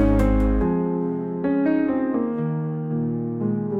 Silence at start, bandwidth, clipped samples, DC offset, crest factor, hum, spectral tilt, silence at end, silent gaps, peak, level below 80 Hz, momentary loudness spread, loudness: 0 s; 7.8 kHz; under 0.1%; under 0.1%; 14 dB; none; -10 dB/octave; 0 s; none; -6 dBFS; -30 dBFS; 6 LU; -23 LUFS